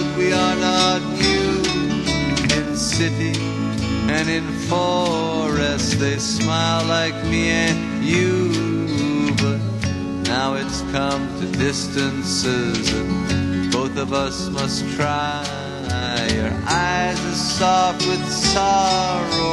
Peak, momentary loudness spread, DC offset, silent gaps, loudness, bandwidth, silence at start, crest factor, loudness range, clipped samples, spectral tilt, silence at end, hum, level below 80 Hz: -2 dBFS; 6 LU; under 0.1%; none; -20 LUFS; 12.5 kHz; 0 s; 18 dB; 3 LU; under 0.1%; -4.5 dB/octave; 0 s; none; -36 dBFS